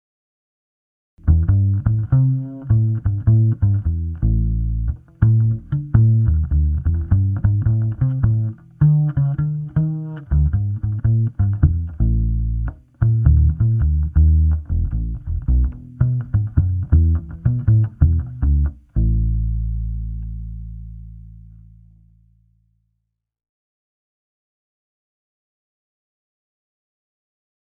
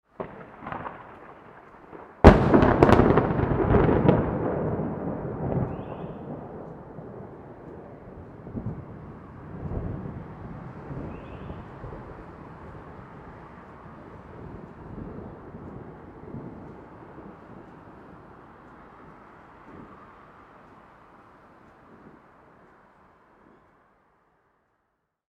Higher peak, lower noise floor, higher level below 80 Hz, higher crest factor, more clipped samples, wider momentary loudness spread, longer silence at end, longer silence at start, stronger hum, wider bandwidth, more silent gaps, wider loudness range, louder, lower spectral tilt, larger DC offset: about the same, 0 dBFS vs 0 dBFS; about the same, -75 dBFS vs -77 dBFS; first, -24 dBFS vs -38 dBFS; second, 18 dB vs 28 dB; neither; second, 10 LU vs 28 LU; first, 6.35 s vs 5.45 s; first, 1.25 s vs 0.2 s; neither; second, 1.8 kHz vs 10 kHz; neither; second, 6 LU vs 26 LU; first, -19 LUFS vs -24 LUFS; first, -13.5 dB/octave vs -9 dB/octave; neither